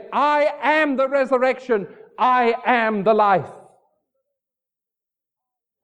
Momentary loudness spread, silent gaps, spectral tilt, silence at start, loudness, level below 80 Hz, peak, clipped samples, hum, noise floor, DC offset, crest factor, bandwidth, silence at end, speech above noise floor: 6 LU; none; -6 dB/octave; 0 s; -19 LUFS; -70 dBFS; -4 dBFS; under 0.1%; none; -87 dBFS; under 0.1%; 18 dB; 9 kHz; 2.25 s; 69 dB